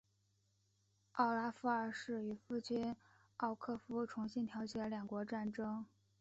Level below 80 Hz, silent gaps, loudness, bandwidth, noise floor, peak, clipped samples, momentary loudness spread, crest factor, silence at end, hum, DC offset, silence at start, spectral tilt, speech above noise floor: -78 dBFS; none; -42 LUFS; 8 kHz; -79 dBFS; -22 dBFS; under 0.1%; 8 LU; 20 dB; 0.35 s; none; under 0.1%; 1.15 s; -4.5 dB/octave; 38 dB